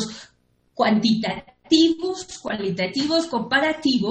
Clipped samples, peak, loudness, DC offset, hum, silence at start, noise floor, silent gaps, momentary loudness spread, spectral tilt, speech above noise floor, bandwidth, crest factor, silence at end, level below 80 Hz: under 0.1%; -6 dBFS; -21 LUFS; under 0.1%; none; 0 s; -63 dBFS; none; 14 LU; -4.5 dB/octave; 42 dB; 9 kHz; 16 dB; 0 s; -58 dBFS